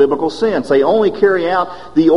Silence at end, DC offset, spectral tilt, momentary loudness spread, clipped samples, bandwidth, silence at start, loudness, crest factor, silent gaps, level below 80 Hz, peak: 0 s; 1%; -6.5 dB/octave; 5 LU; under 0.1%; 10.5 kHz; 0 s; -14 LUFS; 12 dB; none; -48 dBFS; 0 dBFS